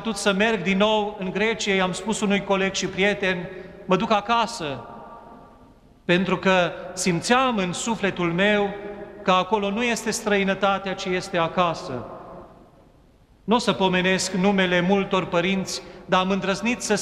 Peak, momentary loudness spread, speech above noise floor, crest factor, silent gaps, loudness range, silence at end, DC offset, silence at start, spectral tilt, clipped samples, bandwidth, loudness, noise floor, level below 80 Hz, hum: -6 dBFS; 12 LU; 32 dB; 18 dB; none; 3 LU; 0 s; under 0.1%; 0 s; -4.5 dB/octave; under 0.1%; 13.5 kHz; -22 LUFS; -54 dBFS; -52 dBFS; none